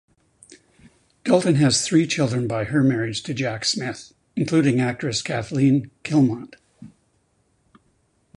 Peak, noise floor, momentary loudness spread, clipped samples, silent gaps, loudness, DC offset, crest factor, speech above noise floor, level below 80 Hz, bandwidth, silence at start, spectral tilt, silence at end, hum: -4 dBFS; -65 dBFS; 10 LU; under 0.1%; none; -21 LUFS; under 0.1%; 20 dB; 45 dB; -56 dBFS; 11 kHz; 0.5 s; -5 dB/octave; 1.5 s; none